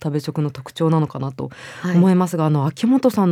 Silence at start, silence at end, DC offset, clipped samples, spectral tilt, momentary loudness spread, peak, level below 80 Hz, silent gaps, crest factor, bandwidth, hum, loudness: 0 s; 0 s; under 0.1%; under 0.1%; -8 dB/octave; 12 LU; -4 dBFS; -62 dBFS; none; 14 dB; 15.5 kHz; none; -19 LUFS